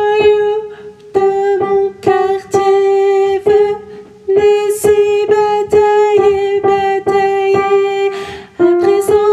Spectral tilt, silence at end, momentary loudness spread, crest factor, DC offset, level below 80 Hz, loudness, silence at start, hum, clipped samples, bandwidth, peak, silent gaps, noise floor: -5 dB/octave; 0 s; 6 LU; 12 dB; under 0.1%; -48 dBFS; -12 LUFS; 0 s; none; under 0.1%; 13 kHz; 0 dBFS; none; -33 dBFS